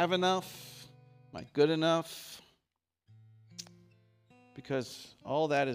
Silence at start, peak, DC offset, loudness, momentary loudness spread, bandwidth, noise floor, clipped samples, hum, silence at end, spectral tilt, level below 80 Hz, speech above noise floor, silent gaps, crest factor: 0 s; -14 dBFS; under 0.1%; -32 LUFS; 23 LU; 15.5 kHz; -86 dBFS; under 0.1%; none; 0 s; -5 dB/octave; -76 dBFS; 55 dB; none; 20 dB